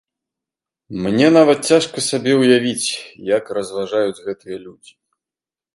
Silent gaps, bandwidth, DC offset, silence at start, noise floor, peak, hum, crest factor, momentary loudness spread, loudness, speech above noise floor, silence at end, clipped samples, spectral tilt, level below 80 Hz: none; 11.5 kHz; under 0.1%; 0.9 s; under -90 dBFS; 0 dBFS; none; 18 dB; 17 LU; -16 LUFS; over 73 dB; 1.05 s; under 0.1%; -4.5 dB/octave; -60 dBFS